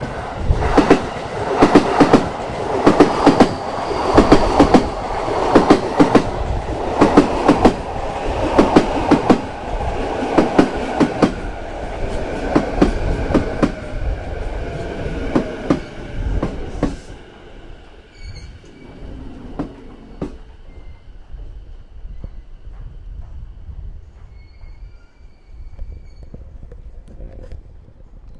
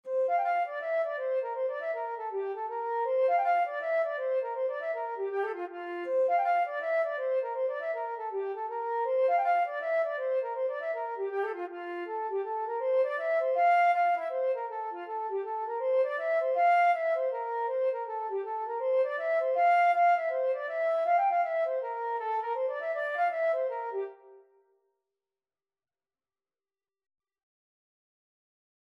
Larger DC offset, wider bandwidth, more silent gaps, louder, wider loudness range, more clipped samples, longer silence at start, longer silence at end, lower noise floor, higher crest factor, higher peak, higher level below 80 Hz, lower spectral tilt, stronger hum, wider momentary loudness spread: neither; first, 11.5 kHz vs 6 kHz; neither; first, -17 LUFS vs -30 LUFS; first, 23 LU vs 5 LU; neither; about the same, 0 s vs 0.05 s; second, 0 s vs 4.5 s; second, -42 dBFS vs under -90 dBFS; first, 18 dB vs 12 dB; first, 0 dBFS vs -18 dBFS; first, -28 dBFS vs under -90 dBFS; first, -6.5 dB/octave vs -2.5 dB/octave; neither; first, 25 LU vs 10 LU